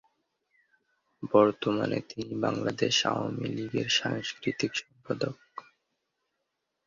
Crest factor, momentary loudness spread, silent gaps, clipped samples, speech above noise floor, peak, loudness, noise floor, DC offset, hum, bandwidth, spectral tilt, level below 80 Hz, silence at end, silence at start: 24 dB; 13 LU; none; under 0.1%; 53 dB; -8 dBFS; -29 LUFS; -82 dBFS; under 0.1%; none; 7.6 kHz; -4 dB/octave; -68 dBFS; 1.25 s; 1.2 s